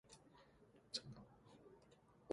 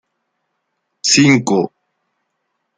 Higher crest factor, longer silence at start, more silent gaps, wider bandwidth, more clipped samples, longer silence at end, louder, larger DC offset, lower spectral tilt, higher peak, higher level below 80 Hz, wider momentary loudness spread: first, 30 dB vs 18 dB; second, 0.05 s vs 1.05 s; neither; first, 11 kHz vs 9.6 kHz; neither; second, 0 s vs 1.1 s; second, -53 LUFS vs -13 LUFS; neither; about the same, -3.5 dB/octave vs -3.5 dB/octave; second, -28 dBFS vs 0 dBFS; second, -80 dBFS vs -60 dBFS; first, 19 LU vs 11 LU